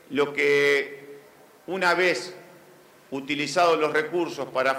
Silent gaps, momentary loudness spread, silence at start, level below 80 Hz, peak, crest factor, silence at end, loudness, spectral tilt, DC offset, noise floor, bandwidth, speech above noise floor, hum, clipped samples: none; 15 LU; 0.1 s; -74 dBFS; -8 dBFS; 16 dB; 0 s; -23 LUFS; -3.5 dB/octave; under 0.1%; -52 dBFS; 16 kHz; 29 dB; none; under 0.1%